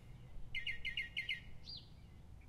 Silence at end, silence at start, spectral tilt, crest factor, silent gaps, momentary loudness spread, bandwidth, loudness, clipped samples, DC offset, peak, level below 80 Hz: 0 s; 0 s; -3 dB/octave; 18 dB; none; 18 LU; 13.5 kHz; -44 LUFS; under 0.1%; under 0.1%; -28 dBFS; -58 dBFS